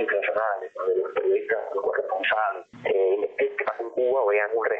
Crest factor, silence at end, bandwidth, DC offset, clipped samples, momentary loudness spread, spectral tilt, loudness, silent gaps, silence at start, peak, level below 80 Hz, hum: 14 dB; 0 s; 4.3 kHz; under 0.1%; under 0.1%; 6 LU; -6 dB/octave; -25 LUFS; none; 0 s; -12 dBFS; -72 dBFS; none